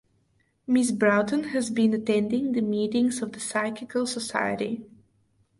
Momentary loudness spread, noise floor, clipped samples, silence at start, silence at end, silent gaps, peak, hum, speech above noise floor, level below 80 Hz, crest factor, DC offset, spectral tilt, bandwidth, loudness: 8 LU; -68 dBFS; under 0.1%; 0.7 s; 0.75 s; none; -8 dBFS; none; 43 dB; -68 dBFS; 18 dB; under 0.1%; -4.5 dB/octave; 11.5 kHz; -26 LUFS